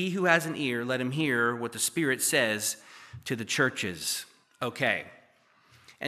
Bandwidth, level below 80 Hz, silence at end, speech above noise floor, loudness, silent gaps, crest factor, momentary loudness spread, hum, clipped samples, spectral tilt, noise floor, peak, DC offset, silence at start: 15 kHz; -72 dBFS; 0 s; 34 dB; -28 LUFS; none; 24 dB; 12 LU; none; under 0.1%; -3 dB/octave; -63 dBFS; -6 dBFS; under 0.1%; 0 s